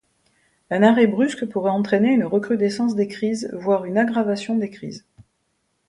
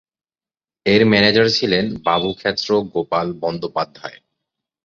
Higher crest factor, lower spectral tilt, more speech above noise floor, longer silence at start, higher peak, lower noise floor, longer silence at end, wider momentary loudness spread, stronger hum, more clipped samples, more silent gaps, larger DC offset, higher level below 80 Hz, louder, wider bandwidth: about the same, 18 dB vs 18 dB; about the same, -6.5 dB/octave vs -5.5 dB/octave; second, 51 dB vs over 72 dB; second, 0.7 s vs 0.85 s; about the same, -2 dBFS vs 0 dBFS; second, -70 dBFS vs under -90 dBFS; first, 0.9 s vs 0.7 s; about the same, 10 LU vs 12 LU; neither; neither; neither; neither; second, -64 dBFS vs -52 dBFS; second, -20 LUFS vs -17 LUFS; first, 11.5 kHz vs 7.6 kHz